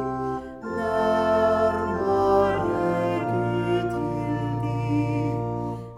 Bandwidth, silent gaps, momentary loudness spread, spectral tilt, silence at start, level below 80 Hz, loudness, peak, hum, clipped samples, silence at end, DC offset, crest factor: 12 kHz; none; 9 LU; -8 dB/octave; 0 s; -48 dBFS; -24 LUFS; -8 dBFS; none; under 0.1%; 0 s; under 0.1%; 16 dB